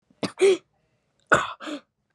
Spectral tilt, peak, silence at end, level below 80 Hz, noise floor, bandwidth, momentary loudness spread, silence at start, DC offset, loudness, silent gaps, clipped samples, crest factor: -4 dB/octave; -4 dBFS; 0.35 s; -62 dBFS; -70 dBFS; 11.5 kHz; 15 LU; 0.25 s; under 0.1%; -23 LUFS; none; under 0.1%; 22 dB